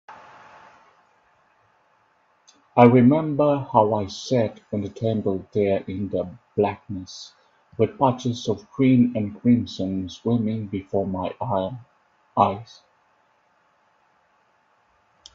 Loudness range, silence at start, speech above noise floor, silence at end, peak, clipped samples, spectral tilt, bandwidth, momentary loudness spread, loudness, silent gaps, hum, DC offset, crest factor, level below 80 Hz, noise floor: 8 LU; 0.1 s; 42 dB; 2.7 s; 0 dBFS; under 0.1%; -7.5 dB/octave; 7.4 kHz; 13 LU; -22 LUFS; none; none; under 0.1%; 24 dB; -62 dBFS; -63 dBFS